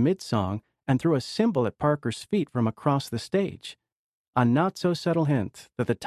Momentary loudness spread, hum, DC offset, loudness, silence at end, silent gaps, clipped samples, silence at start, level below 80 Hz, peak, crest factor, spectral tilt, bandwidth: 8 LU; none; under 0.1%; -26 LUFS; 0 s; 3.92-4.33 s; under 0.1%; 0 s; -54 dBFS; -8 dBFS; 18 dB; -7 dB/octave; 13.5 kHz